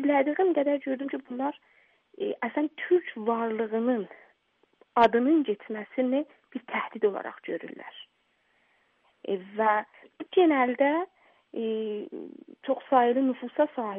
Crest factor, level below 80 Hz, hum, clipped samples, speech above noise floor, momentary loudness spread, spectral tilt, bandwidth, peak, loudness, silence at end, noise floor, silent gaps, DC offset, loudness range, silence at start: 20 dB; -76 dBFS; none; under 0.1%; 44 dB; 18 LU; -3 dB/octave; 5.4 kHz; -8 dBFS; -27 LUFS; 0 s; -71 dBFS; none; under 0.1%; 6 LU; 0 s